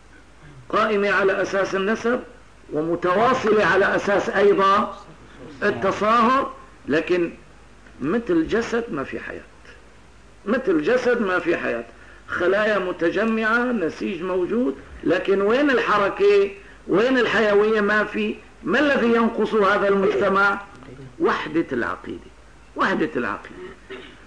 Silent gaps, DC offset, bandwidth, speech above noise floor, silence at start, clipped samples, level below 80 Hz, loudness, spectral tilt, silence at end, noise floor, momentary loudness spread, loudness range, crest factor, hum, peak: none; 0.3%; 10 kHz; 29 dB; 0.45 s; under 0.1%; -52 dBFS; -21 LUFS; -5.5 dB/octave; 0.15 s; -49 dBFS; 14 LU; 6 LU; 12 dB; none; -8 dBFS